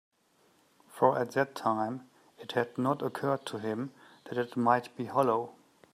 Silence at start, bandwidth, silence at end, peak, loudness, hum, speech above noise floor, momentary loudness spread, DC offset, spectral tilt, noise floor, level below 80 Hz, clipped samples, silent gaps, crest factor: 0.95 s; 15.5 kHz; 0.4 s; -10 dBFS; -31 LUFS; none; 38 dB; 10 LU; under 0.1%; -6.5 dB/octave; -68 dBFS; -80 dBFS; under 0.1%; none; 22 dB